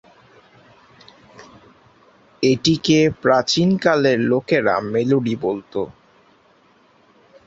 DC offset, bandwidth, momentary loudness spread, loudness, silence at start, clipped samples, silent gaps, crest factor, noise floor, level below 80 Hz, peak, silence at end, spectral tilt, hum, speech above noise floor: under 0.1%; 8 kHz; 9 LU; -18 LUFS; 1.4 s; under 0.1%; none; 20 dB; -55 dBFS; -56 dBFS; -2 dBFS; 1.55 s; -5.5 dB/octave; none; 37 dB